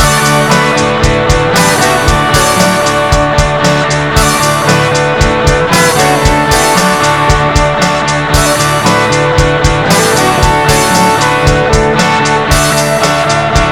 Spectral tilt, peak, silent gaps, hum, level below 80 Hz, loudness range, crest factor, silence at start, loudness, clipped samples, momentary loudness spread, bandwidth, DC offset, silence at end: -4 dB/octave; 0 dBFS; none; none; -20 dBFS; 1 LU; 8 dB; 0 s; -8 LUFS; 0.8%; 2 LU; 20 kHz; 1%; 0 s